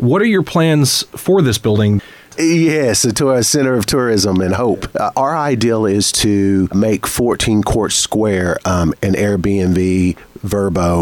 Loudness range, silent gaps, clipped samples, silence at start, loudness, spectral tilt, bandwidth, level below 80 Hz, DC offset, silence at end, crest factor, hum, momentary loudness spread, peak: 1 LU; none; under 0.1%; 0 s; -14 LUFS; -5 dB/octave; 18 kHz; -36 dBFS; under 0.1%; 0 s; 10 dB; none; 4 LU; -4 dBFS